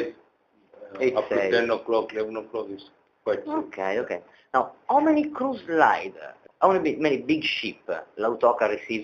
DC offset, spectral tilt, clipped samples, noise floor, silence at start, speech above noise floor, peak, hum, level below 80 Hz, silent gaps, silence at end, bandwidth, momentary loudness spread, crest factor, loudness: under 0.1%; -5.5 dB/octave; under 0.1%; -63 dBFS; 0 s; 39 dB; -4 dBFS; none; -66 dBFS; none; 0 s; 7.2 kHz; 13 LU; 22 dB; -25 LUFS